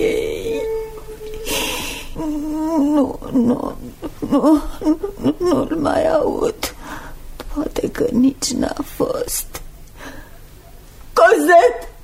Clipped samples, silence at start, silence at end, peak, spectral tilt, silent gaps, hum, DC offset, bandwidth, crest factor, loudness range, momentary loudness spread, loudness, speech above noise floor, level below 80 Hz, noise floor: under 0.1%; 0 s; 0 s; 0 dBFS; -4 dB/octave; none; none; under 0.1%; 16 kHz; 18 dB; 4 LU; 19 LU; -18 LUFS; 24 dB; -36 dBFS; -40 dBFS